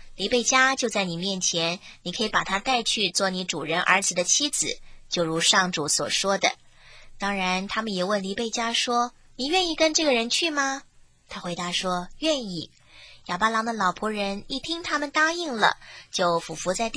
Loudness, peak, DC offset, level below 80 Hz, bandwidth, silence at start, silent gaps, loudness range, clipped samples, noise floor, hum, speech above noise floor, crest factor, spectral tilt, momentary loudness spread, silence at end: -24 LUFS; -4 dBFS; under 0.1%; -52 dBFS; 10.5 kHz; 0 s; none; 5 LU; under 0.1%; -49 dBFS; none; 24 dB; 22 dB; -2 dB/octave; 11 LU; 0 s